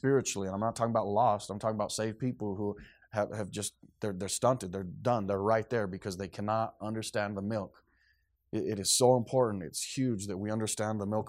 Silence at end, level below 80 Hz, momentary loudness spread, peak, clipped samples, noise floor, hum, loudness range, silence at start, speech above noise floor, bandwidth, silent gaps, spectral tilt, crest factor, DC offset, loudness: 0 s; -66 dBFS; 10 LU; -12 dBFS; under 0.1%; -72 dBFS; none; 4 LU; 0.05 s; 41 dB; 16 kHz; none; -4.5 dB/octave; 20 dB; under 0.1%; -32 LUFS